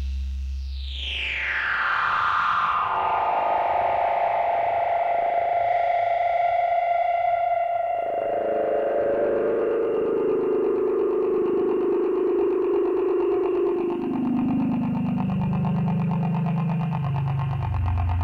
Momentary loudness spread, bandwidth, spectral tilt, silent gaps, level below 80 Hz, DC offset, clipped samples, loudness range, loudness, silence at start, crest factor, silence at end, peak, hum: 4 LU; 7.2 kHz; -8.5 dB/octave; none; -40 dBFS; under 0.1%; under 0.1%; 2 LU; -23 LUFS; 0 s; 10 dB; 0 s; -12 dBFS; none